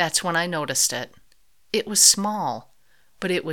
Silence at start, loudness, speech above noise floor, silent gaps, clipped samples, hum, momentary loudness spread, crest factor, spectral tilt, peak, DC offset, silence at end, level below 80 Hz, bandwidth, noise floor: 0 s; -20 LUFS; 41 dB; none; under 0.1%; none; 17 LU; 22 dB; -1.5 dB/octave; -2 dBFS; 0.2%; 0 s; -64 dBFS; 19 kHz; -64 dBFS